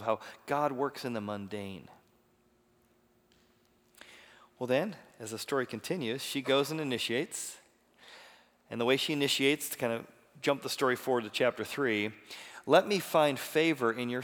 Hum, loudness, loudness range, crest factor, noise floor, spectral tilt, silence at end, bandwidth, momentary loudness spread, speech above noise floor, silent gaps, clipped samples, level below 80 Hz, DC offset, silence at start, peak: none; -31 LUFS; 11 LU; 24 dB; -69 dBFS; -4 dB/octave; 0 s; over 20 kHz; 16 LU; 37 dB; none; under 0.1%; -80 dBFS; under 0.1%; 0 s; -10 dBFS